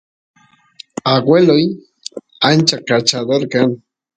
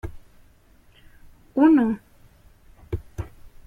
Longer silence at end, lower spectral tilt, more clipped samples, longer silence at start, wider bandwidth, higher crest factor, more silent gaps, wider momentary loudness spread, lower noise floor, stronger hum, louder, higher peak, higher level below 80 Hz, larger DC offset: about the same, 0.4 s vs 0.4 s; second, -4.5 dB/octave vs -9 dB/octave; neither; first, 1.05 s vs 0.05 s; first, 9.6 kHz vs 6.4 kHz; about the same, 16 dB vs 20 dB; neither; about the same, 20 LU vs 22 LU; second, -43 dBFS vs -55 dBFS; neither; first, -14 LUFS vs -22 LUFS; first, 0 dBFS vs -6 dBFS; second, -60 dBFS vs -44 dBFS; neither